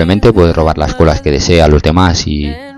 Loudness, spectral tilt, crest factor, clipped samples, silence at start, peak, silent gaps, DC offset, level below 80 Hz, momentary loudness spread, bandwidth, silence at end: -10 LUFS; -6 dB/octave; 10 dB; 0.5%; 0 s; 0 dBFS; none; under 0.1%; -18 dBFS; 6 LU; 11 kHz; 0 s